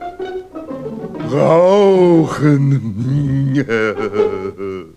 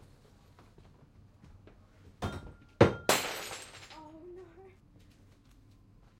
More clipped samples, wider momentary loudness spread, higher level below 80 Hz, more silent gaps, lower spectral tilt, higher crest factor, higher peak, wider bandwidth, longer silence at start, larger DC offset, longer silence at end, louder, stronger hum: neither; second, 17 LU vs 24 LU; first, -48 dBFS vs -58 dBFS; neither; first, -8 dB/octave vs -4.5 dB/octave; second, 14 dB vs 30 dB; first, 0 dBFS vs -6 dBFS; second, 9.6 kHz vs 16.5 kHz; second, 0 s vs 2.2 s; neither; second, 0.1 s vs 1.5 s; first, -14 LUFS vs -31 LUFS; neither